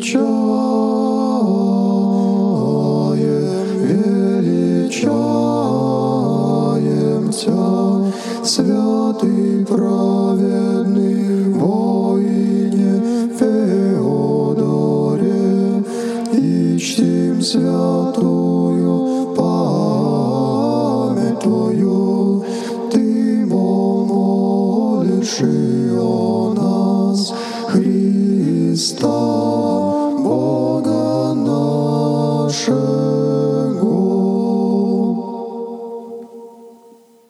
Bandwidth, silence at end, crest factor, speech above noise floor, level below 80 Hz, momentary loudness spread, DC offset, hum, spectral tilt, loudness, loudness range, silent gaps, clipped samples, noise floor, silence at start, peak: 12.5 kHz; 0.6 s; 14 dB; 31 dB; -64 dBFS; 2 LU; under 0.1%; none; -7 dB/octave; -16 LUFS; 1 LU; none; under 0.1%; -46 dBFS; 0 s; -2 dBFS